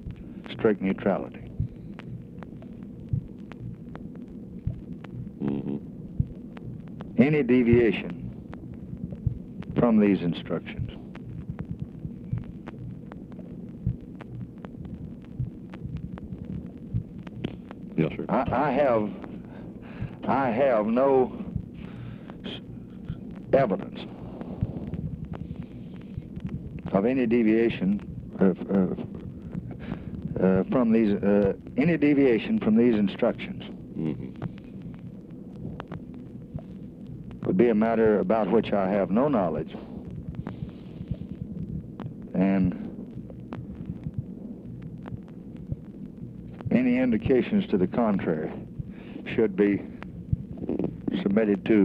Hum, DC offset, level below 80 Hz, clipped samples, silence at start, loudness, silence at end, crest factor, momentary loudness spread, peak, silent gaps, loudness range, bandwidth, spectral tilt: none; under 0.1%; -48 dBFS; under 0.1%; 0 s; -27 LUFS; 0 s; 20 dB; 19 LU; -6 dBFS; none; 13 LU; 5.2 kHz; -10 dB/octave